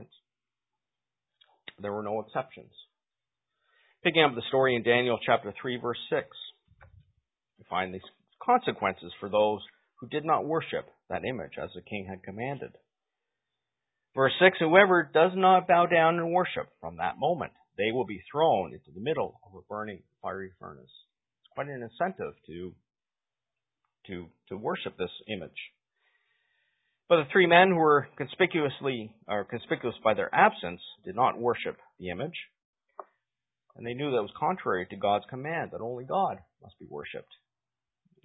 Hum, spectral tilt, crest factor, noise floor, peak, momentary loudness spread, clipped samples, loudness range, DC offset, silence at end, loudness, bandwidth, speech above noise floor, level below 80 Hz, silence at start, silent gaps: none; -9.5 dB/octave; 26 dB; under -90 dBFS; -4 dBFS; 20 LU; under 0.1%; 15 LU; under 0.1%; 1.05 s; -28 LUFS; 4 kHz; over 62 dB; -66 dBFS; 0 s; 32.65-32.73 s